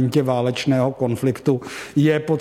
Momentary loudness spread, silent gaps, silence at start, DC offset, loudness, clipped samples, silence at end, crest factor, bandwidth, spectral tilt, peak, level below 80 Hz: 4 LU; none; 0 s; under 0.1%; -20 LUFS; under 0.1%; 0 s; 14 dB; 15.5 kHz; -7 dB/octave; -6 dBFS; -58 dBFS